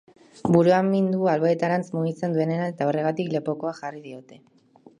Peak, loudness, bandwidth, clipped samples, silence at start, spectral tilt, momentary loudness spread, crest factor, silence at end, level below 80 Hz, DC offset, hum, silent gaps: -4 dBFS; -23 LUFS; 10 kHz; under 0.1%; 0.45 s; -8 dB/octave; 16 LU; 20 dB; 0.65 s; -66 dBFS; under 0.1%; none; none